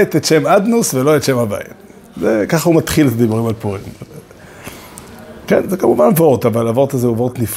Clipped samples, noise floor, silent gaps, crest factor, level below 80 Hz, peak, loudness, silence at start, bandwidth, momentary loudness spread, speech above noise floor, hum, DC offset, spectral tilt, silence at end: under 0.1%; -36 dBFS; none; 14 dB; -44 dBFS; 0 dBFS; -14 LUFS; 0 s; 16.5 kHz; 22 LU; 23 dB; none; under 0.1%; -5.5 dB/octave; 0 s